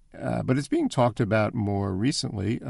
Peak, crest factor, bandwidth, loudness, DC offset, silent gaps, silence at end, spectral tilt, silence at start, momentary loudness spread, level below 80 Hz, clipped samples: -8 dBFS; 16 dB; 11.5 kHz; -26 LUFS; under 0.1%; none; 0 s; -6 dB/octave; 0.15 s; 5 LU; -52 dBFS; under 0.1%